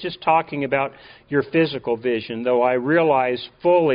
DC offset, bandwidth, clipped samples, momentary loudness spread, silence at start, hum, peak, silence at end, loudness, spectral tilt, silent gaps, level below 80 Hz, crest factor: under 0.1%; 5.2 kHz; under 0.1%; 6 LU; 0 s; none; -6 dBFS; 0 s; -21 LUFS; -4 dB/octave; none; -60 dBFS; 14 dB